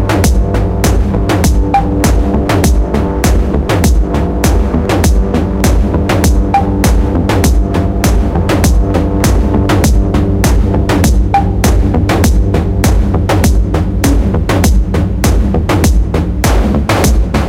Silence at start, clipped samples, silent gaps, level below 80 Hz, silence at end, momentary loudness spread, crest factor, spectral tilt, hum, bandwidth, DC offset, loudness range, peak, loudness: 0 s; under 0.1%; none; -12 dBFS; 0 s; 2 LU; 10 dB; -6 dB/octave; none; 17 kHz; under 0.1%; 1 LU; 0 dBFS; -11 LUFS